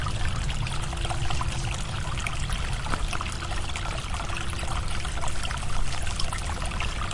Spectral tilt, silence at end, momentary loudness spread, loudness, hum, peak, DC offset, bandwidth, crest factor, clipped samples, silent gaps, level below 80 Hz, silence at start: -3.5 dB/octave; 0 s; 2 LU; -31 LUFS; none; -8 dBFS; under 0.1%; 11.5 kHz; 18 dB; under 0.1%; none; -32 dBFS; 0 s